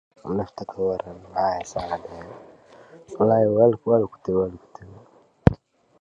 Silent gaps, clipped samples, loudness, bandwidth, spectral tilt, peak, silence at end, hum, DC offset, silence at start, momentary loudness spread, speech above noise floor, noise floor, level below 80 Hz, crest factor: none; under 0.1%; -23 LUFS; 8 kHz; -8 dB/octave; 0 dBFS; 0.45 s; none; under 0.1%; 0.25 s; 21 LU; 29 dB; -52 dBFS; -42 dBFS; 24 dB